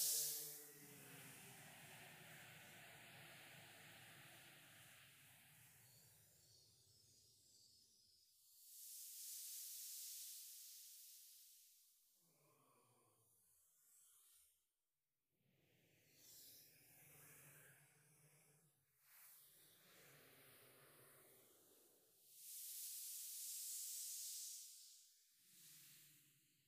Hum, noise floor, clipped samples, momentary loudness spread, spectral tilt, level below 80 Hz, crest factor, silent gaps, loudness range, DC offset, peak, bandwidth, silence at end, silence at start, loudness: none; under -90 dBFS; under 0.1%; 20 LU; 0 dB/octave; under -90 dBFS; 28 dB; none; 17 LU; under 0.1%; -30 dBFS; 15.5 kHz; 0.05 s; 0 s; -53 LUFS